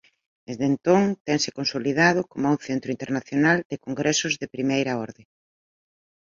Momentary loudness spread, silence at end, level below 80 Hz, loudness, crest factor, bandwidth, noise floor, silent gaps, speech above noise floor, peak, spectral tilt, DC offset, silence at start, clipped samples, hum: 9 LU; 1.2 s; -64 dBFS; -23 LUFS; 20 dB; 7.6 kHz; under -90 dBFS; 1.21-1.25 s, 3.65-3.70 s; over 67 dB; -4 dBFS; -4.5 dB/octave; under 0.1%; 0.5 s; under 0.1%; none